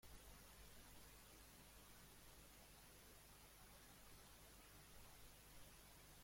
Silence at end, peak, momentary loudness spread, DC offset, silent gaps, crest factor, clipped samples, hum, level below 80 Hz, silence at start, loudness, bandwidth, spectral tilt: 0 s; -48 dBFS; 1 LU; under 0.1%; none; 16 dB; under 0.1%; 50 Hz at -70 dBFS; -70 dBFS; 0 s; -64 LUFS; 16.5 kHz; -2.5 dB/octave